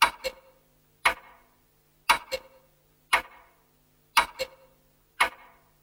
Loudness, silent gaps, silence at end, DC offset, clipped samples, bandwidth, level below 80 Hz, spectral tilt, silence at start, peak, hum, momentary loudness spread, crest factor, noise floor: -28 LUFS; none; 0.55 s; under 0.1%; under 0.1%; 16.5 kHz; -58 dBFS; 0 dB/octave; 0 s; -4 dBFS; none; 12 LU; 28 dB; -65 dBFS